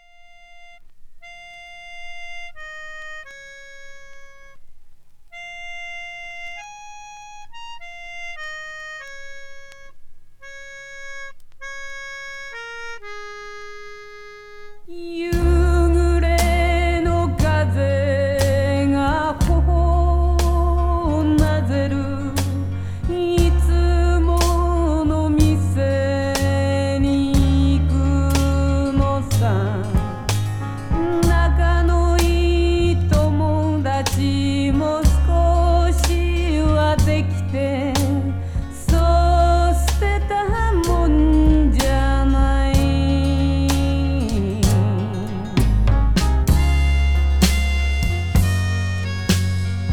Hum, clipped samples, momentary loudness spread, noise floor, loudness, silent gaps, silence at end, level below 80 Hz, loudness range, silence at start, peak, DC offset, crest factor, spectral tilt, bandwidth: 50 Hz at -50 dBFS; under 0.1%; 19 LU; -45 dBFS; -19 LUFS; none; 0 s; -22 dBFS; 18 LU; 0.5 s; 0 dBFS; under 0.1%; 18 dB; -6.5 dB/octave; 16 kHz